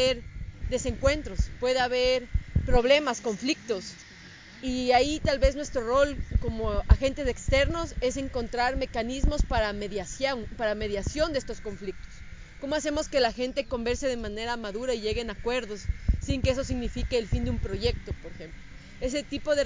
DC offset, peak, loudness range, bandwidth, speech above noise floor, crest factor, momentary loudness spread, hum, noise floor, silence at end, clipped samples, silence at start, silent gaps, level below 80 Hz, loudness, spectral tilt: under 0.1%; -6 dBFS; 4 LU; 7.6 kHz; 21 dB; 22 dB; 15 LU; none; -48 dBFS; 0 s; under 0.1%; 0 s; none; -34 dBFS; -28 LUFS; -5 dB/octave